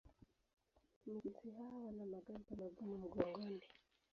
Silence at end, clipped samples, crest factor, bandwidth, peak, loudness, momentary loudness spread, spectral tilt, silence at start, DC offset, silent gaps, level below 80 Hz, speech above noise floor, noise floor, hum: 0.35 s; under 0.1%; 28 dB; 6.8 kHz; -22 dBFS; -50 LUFS; 10 LU; -6.5 dB/octave; 0.05 s; under 0.1%; 0.53-0.57 s, 0.96-1.01 s; -74 dBFS; 21 dB; -70 dBFS; none